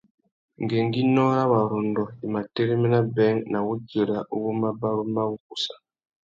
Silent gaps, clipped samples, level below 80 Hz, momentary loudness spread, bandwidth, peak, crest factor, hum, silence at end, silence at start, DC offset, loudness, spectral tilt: 5.40-5.50 s; under 0.1%; -64 dBFS; 9 LU; 7.8 kHz; -8 dBFS; 16 dB; none; 0.65 s; 0.6 s; under 0.1%; -24 LUFS; -7.5 dB/octave